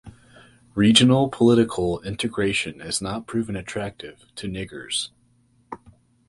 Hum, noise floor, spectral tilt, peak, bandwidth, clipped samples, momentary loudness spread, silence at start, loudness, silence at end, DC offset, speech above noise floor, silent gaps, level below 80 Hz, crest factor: none; -61 dBFS; -4.5 dB/octave; -2 dBFS; 11.5 kHz; under 0.1%; 22 LU; 0.05 s; -22 LUFS; 0.55 s; under 0.1%; 39 dB; none; -50 dBFS; 22 dB